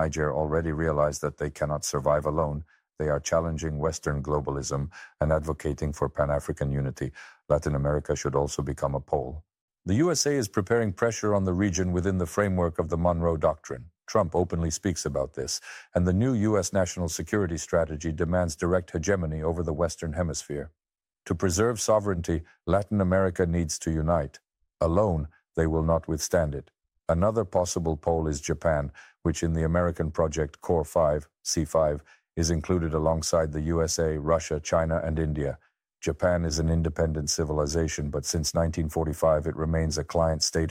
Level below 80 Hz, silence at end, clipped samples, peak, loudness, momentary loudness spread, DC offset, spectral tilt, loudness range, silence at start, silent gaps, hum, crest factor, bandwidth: -40 dBFS; 0 s; under 0.1%; -10 dBFS; -27 LUFS; 7 LU; under 0.1%; -5.5 dB/octave; 3 LU; 0 s; 9.61-9.68 s; none; 16 dB; 16 kHz